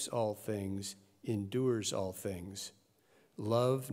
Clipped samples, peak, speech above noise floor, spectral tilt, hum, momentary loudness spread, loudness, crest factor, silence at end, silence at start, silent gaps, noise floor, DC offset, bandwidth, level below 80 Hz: under 0.1%; -18 dBFS; 33 dB; -5.5 dB/octave; none; 13 LU; -37 LUFS; 18 dB; 0 s; 0 s; none; -69 dBFS; under 0.1%; 16 kHz; -78 dBFS